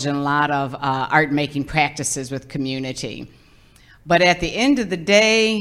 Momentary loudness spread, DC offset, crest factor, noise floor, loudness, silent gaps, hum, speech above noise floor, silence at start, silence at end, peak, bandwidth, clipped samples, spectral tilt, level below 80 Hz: 12 LU; under 0.1%; 18 dB; -50 dBFS; -19 LUFS; none; none; 31 dB; 0 s; 0 s; -2 dBFS; 15 kHz; under 0.1%; -4 dB/octave; -46 dBFS